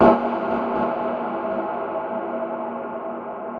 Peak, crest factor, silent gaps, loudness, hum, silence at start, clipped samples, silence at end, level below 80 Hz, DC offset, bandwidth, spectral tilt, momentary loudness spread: -4 dBFS; 18 dB; none; -25 LUFS; none; 0 s; under 0.1%; 0 s; -54 dBFS; under 0.1%; 5.4 kHz; -8.5 dB/octave; 8 LU